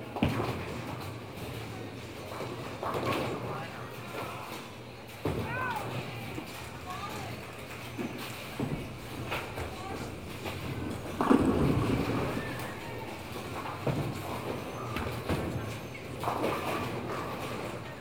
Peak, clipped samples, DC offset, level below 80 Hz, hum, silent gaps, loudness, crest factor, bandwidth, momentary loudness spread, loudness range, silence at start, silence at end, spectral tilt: -10 dBFS; under 0.1%; 0.1%; -52 dBFS; none; none; -35 LUFS; 24 dB; 19.5 kHz; 10 LU; 7 LU; 0 s; 0 s; -6 dB/octave